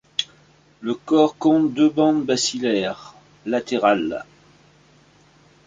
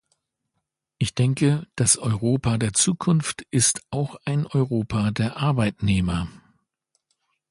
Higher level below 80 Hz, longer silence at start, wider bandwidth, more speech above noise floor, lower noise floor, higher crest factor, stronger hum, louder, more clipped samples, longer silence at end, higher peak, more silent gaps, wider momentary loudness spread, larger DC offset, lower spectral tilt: second, -62 dBFS vs -44 dBFS; second, 0.2 s vs 1 s; second, 9.4 kHz vs 11.5 kHz; second, 35 dB vs 57 dB; second, -54 dBFS vs -79 dBFS; about the same, 18 dB vs 20 dB; neither; about the same, -20 LUFS vs -22 LUFS; neither; first, 1.45 s vs 1.15 s; about the same, -4 dBFS vs -4 dBFS; neither; first, 15 LU vs 7 LU; neither; about the same, -4 dB/octave vs -4.5 dB/octave